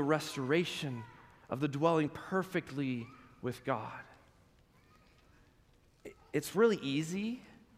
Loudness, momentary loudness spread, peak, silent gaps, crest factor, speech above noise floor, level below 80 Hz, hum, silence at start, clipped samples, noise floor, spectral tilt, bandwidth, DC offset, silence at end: -35 LUFS; 19 LU; -14 dBFS; none; 22 dB; 32 dB; -70 dBFS; none; 0 s; under 0.1%; -66 dBFS; -5.5 dB/octave; 15.5 kHz; under 0.1%; 0.2 s